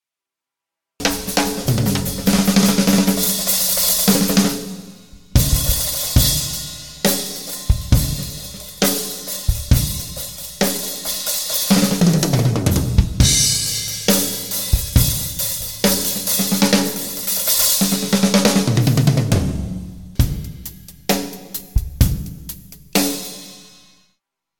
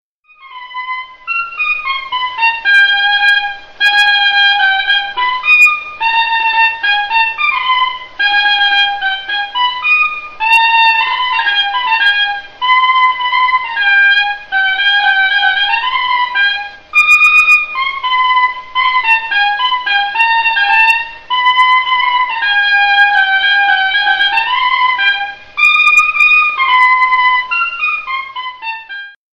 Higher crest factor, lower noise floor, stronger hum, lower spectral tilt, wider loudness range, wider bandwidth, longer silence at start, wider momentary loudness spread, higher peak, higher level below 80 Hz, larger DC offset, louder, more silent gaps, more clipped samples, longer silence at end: first, 18 dB vs 12 dB; first, -87 dBFS vs -40 dBFS; neither; first, -4 dB/octave vs 1.5 dB/octave; first, 6 LU vs 2 LU; first, 19.5 kHz vs 14 kHz; first, 1 s vs 0.45 s; first, 14 LU vs 10 LU; about the same, 0 dBFS vs 0 dBFS; first, -28 dBFS vs -50 dBFS; first, 0.5% vs under 0.1%; second, -17 LUFS vs -10 LUFS; neither; neither; first, 0.95 s vs 0.2 s